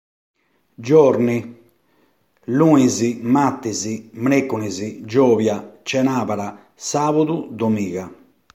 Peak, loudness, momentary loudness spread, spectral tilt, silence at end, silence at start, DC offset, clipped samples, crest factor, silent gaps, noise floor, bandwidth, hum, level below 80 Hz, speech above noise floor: 0 dBFS; -19 LUFS; 15 LU; -6 dB/octave; 0.4 s; 0.8 s; under 0.1%; under 0.1%; 18 dB; none; -61 dBFS; 15 kHz; none; -62 dBFS; 43 dB